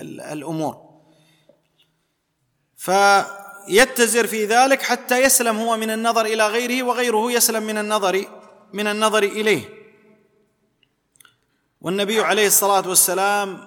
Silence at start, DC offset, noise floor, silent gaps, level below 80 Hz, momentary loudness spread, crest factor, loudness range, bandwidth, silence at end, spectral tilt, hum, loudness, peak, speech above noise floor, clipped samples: 0 s; under 0.1%; -70 dBFS; none; -60 dBFS; 13 LU; 20 dB; 7 LU; 19 kHz; 0 s; -2 dB/octave; none; -18 LUFS; 0 dBFS; 52 dB; under 0.1%